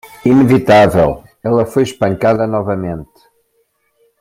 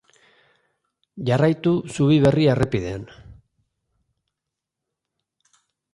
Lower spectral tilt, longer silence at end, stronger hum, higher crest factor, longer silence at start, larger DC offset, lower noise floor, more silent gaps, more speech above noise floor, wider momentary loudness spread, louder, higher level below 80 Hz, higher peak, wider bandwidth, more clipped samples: about the same, -7 dB/octave vs -7.5 dB/octave; second, 1.15 s vs 2.6 s; neither; about the same, 14 dB vs 18 dB; second, 0.05 s vs 1.15 s; neither; second, -62 dBFS vs -84 dBFS; neither; second, 50 dB vs 65 dB; second, 12 LU vs 15 LU; first, -13 LUFS vs -20 LUFS; first, -42 dBFS vs -48 dBFS; first, 0 dBFS vs -6 dBFS; first, 16 kHz vs 11.5 kHz; neither